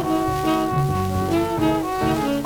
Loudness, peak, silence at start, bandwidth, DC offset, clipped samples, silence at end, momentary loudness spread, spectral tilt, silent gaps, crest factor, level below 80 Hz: -21 LUFS; -8 dBFS; 0 s; 19.5 kHz; under 0.1%; under 0.1%; 0 s; 1 LU; -6.5 dB/octave; none; 14 dB; -40 dBFS